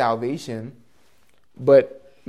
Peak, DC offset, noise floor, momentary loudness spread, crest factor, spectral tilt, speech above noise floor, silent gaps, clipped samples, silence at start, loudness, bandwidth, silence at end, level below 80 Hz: -4 dBFS; 0.2%; -63 dBFS; 18 LU; 18 dB; -6.5 dB/octave; 43 dB; none; under 0.1%; 0 s; -19 LUFS; 11.5 kHz; 0.4 s; -66 dBFS